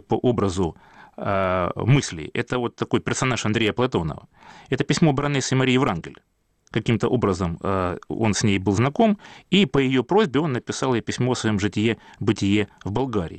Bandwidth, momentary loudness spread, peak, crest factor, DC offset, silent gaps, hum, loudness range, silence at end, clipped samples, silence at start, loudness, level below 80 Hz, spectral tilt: 9.2 kHz; 8 LU; -8 dBFS; 14 dB; under 0.1%; none; none; 2 LU; 0 s; under 0.1%; 0.1 s; -22 LUFS; -48 dBFS; -5.5 dB/octave